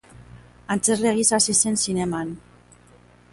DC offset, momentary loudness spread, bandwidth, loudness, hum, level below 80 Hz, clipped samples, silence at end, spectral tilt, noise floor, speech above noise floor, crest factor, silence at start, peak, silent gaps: under 0.1%; 13 LU; 11.5 kHz; -20 LUFS; 60 Hz at -40 dBFS; -54 dBFS; under 0.1%; 0.95 s; -3 dB/octave; -52 dBFS; 31 dB; 20 dB; 0.15 s; -4 dBFS; none